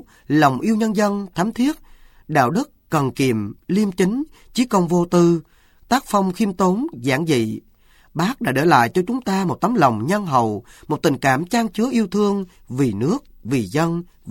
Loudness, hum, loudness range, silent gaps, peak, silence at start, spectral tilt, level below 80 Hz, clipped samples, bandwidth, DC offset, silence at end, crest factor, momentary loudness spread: -20 LUFS; none; 2 LU; none; 0 dBFS; 0.3 s; -6 dB/octave; -50 dBFS; under 0.1%; 17 kHz; under 0.1%; 0 s; 18 dB; 8 LU